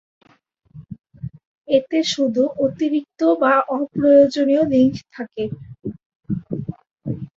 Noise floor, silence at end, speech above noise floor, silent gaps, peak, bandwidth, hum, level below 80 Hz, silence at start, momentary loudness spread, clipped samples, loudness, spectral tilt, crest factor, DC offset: -58 dBFS; 0.1 s; 40 dB; 1.47-1.62 s, 6.06-6.20 s, 6.91-6.96 s; -2 dBFS; 7.8 kHz; none; -54 dBFS; 0.75 s; 20 LU; under 0.1%; -19 LUFS; -6 dB/octave; 18 dB; under 0.1%